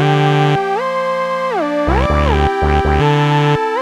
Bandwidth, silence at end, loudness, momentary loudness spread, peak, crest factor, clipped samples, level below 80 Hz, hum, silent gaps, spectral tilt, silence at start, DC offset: 10 kHz; 0 s; -14 LUFS; 5 LU; -2 dBFS; 12 dB; under 0.1%; -22 dBFS; none; none; -7 dB/octave; 0 s; under 0.1%